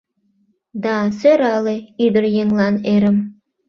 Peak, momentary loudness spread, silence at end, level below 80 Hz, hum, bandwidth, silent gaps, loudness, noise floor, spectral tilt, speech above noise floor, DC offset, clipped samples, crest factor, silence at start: -2 dBFS; 9 LU; 0.35 s; -56 dBFS; none; 6.6 kHz; none; -17 LUFS; -62 dBFS; -7.5 dB/octave; 47 dB; under 0.1%; under 0.1%; 16 dB; 0.75 s